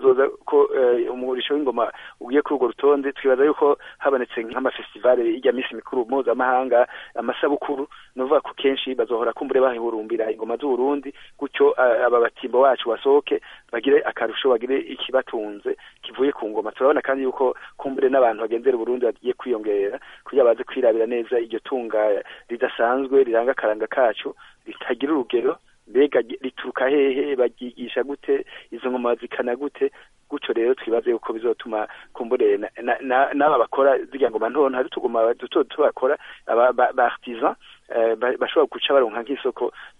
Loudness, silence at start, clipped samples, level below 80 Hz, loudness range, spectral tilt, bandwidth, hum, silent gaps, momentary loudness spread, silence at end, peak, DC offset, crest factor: -22 LUFS; 0 s; under 0.1%; -64 dBFS; 3 LU; -6 dB/octave; 3.8 kHz; none; none; 10 LU; 0.1 s; -4 dBFS; under 0.1%; 16 dB